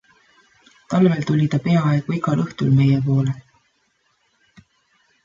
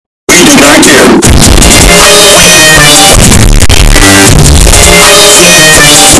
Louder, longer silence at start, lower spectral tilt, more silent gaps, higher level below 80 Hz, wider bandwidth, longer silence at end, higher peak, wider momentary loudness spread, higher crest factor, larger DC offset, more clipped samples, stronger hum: second, -19 LUFS vs 1 LUFS; first, 0.9 s vs 0.3 s; first, -8.5 dB/octave vs -2.5 dB/octave; neither; second, -58 dBFS vs -10 dBFS; second, 7.4 kHz vs 12 kHz; first, 1.85 s vs 0 s; second, -4 dBFS vs 0 dBFS; about the same, 6 LU vs 4 LU; first, 16 dB vs 0 dB; neither; second, under 0.1% vs 90%; neither